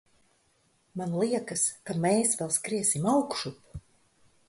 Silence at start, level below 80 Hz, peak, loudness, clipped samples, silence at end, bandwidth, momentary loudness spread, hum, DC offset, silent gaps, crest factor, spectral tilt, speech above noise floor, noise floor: 0.95 s; -62 dBFS; -12 dBFS; -28 LUFS; under 0.1%; 0.7 s; 12 kHz; 18 LU; none; under 0.1%; none; 18 dB; -4 dB/octave; 41 dB; -69 dBFS